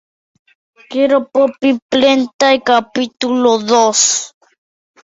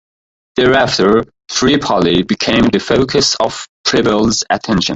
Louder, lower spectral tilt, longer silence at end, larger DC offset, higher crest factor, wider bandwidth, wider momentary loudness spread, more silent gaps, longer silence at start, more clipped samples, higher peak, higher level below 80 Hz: about the same, -13 LUFS vs -13 LUFS; second, -1.5 dB/octave vs -4 dB/octave; first, 0.75 s vs 0 s; neither; about the same, 14 dB vs 12 dB; about the same, 8 kHz vs 8.2 kHz; first, 8 LU vs 5 LU; about the same, 1.82-1.89 s, 2.33-2.39 s vs 3.69-3.84 s; first, 0.9 s vs 0.55 s; neither; about the same, 0 dBFS vs 0 dBFS; second, -60 dBFS vs -38 dBFS